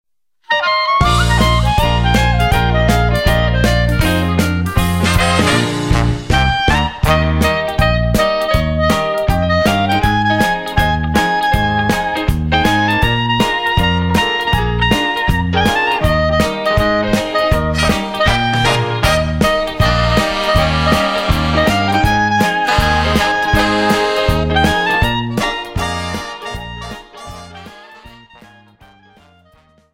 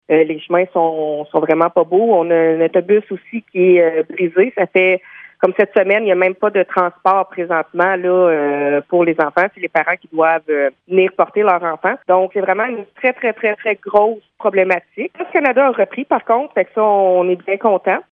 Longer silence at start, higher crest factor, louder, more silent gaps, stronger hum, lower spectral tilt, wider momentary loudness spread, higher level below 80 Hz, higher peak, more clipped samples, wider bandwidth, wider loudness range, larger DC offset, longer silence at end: first, 0.5 s vs 0.1 s; about the same, 14 dB vs 14 dB; about the same, -14 LUFS vs -15 LUFS; neither; neither; second, -5 dB/octave vs -8.5 dB/octave; about the same, 4 LU vs 6 LU; first, -22 dBFS vs -68 dBFS; about the same, 0 dBFS vs 0 dBFS; neither; first, 16.5 kHz vs 4.3 kHz; about the same, 3 LU vs 2 LU; neither; first, 1.85 s vs 0.1 s